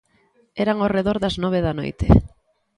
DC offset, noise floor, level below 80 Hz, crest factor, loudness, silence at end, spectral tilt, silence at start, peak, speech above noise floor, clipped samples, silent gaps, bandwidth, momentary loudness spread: under 0.1%; -61 dBFS; -30 dBFS; 20 dB; -20 LUFS; 0.5 s; -8 dB/octave; 0.55 s; 0 dBFS; 42 dB; under 0.1%; none; 11 kHz; 8 LU